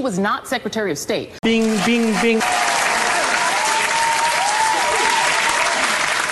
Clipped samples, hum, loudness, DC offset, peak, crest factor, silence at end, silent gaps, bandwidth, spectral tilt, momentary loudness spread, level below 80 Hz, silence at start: under 0.1%; none; -17 LUFS; under 0.1%; -4 dBFS; 14 dB; 0 s; none; 13.5 kHz; -2 dB/octave; 6 LU; -54 dBFS; 0 s